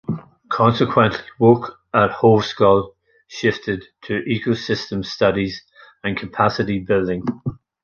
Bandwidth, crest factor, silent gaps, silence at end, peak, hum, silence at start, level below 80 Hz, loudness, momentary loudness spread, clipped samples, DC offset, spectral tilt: 7 kHz; 18 dB; none; 0.3 s; -2 dBFS; none; 0.1 s; -48 dBFS; -19 LUFS; 13 LU; under 0.1%; under 0.1%; -7 dB/octave